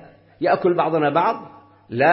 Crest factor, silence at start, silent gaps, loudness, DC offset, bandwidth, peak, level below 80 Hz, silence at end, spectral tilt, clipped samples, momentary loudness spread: 18 dB; 0.4 s; none; -20 LUFS; under 0.1%; 5.8 kHz; -4 dBFS; -64 dBFS; 0 s; -10.5 dB/octave; under 0.1%; 10 LU